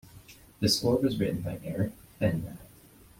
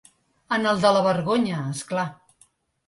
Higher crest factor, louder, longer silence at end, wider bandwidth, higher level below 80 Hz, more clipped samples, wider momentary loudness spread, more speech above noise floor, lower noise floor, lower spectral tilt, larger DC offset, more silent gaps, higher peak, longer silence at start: about the same, 18 dB vs 18 dB; second, -29 LUFS vs -23 LUFS; second, 0.5 s vs 0.75 s; first, 16.5 kHz vs 11.5 kHz; first, -56 dBFS vs -64 dBFS; neither; about the same, 11 LU vs 10 LU; second, 27 dB vs 39 dB; second, -55 dBFS vs -61 dBFS; about the same, -5.5 dB/octave vs -5.5 dB/octave; neither; neither; second, -12 dBFS vs -6 dBFS; second, 0.05 s vs 0.5 s